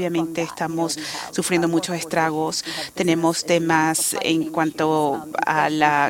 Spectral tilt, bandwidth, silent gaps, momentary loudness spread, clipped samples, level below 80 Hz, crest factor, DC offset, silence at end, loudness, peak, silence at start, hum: -4 dB/octave; 17 kHz; none; 7 LU; under 0.1%; -62 dBFS; 20 dB; under 0.1%; 0 s; -21 LUFS; -2 dBFS; 0 s; none